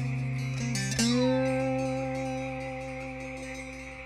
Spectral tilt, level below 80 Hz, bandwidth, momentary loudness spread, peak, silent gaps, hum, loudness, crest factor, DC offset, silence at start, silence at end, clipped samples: -5 dB/octave; -50 dBFS; 14.5 kHz; 12 LU; -14 dBFS; none; none; -31 LUFS; 16 dB; under 0.1%; 0 s; 0 s; under 0.1%